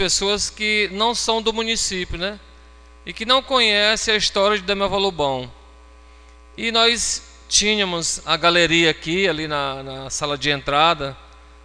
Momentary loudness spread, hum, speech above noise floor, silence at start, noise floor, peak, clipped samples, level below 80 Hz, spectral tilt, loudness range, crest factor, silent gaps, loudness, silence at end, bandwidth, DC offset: 12 LU; none; 26 dB; 0 s; -45 dBFS; -2 dBFS; under 0.1%; -42 dBFS; -2 dB/octave; 3 LU; 20 dB; none; -19 LUFS; 0.4 s; 10 kHz; under 0.1%